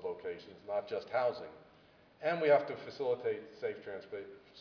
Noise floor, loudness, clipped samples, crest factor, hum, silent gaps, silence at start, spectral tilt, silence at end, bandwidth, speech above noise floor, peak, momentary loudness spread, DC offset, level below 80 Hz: -63 dBFS; -36 LUFS; under 0.1%; 20 dB; none; none; 0 s; -3.5 dB/octave; 0 s; 5.4 kHz; 27 dB; -16 dBFS; 17 LU; under 0.1%; -78 dBFS